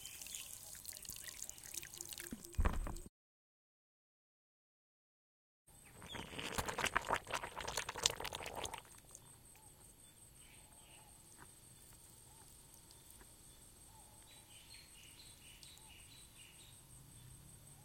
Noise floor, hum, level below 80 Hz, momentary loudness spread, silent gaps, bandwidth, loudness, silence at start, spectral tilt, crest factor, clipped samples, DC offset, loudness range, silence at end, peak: under -90 dBFS; none; -54 dBFS; 20 LU; 3.09-5.65 s; 17 kHz; -44 LUFS; 0 s; -2 dB/octave; 38 dB; under 0.1%; under 0.1%; 18 LU; 0 s; -10 dBFS